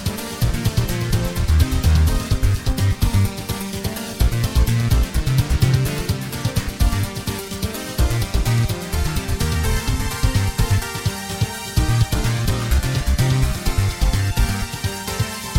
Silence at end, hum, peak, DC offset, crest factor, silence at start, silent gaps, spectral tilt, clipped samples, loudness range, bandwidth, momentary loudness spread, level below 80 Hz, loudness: 0 s; none; -4 dBFS; under 0.1%; 16 dB; 0 s; none; -5 dB/octave; under 0.1%; 2 LU; 19 kHz; 7 LU; -22 dBFS; -21 LUFS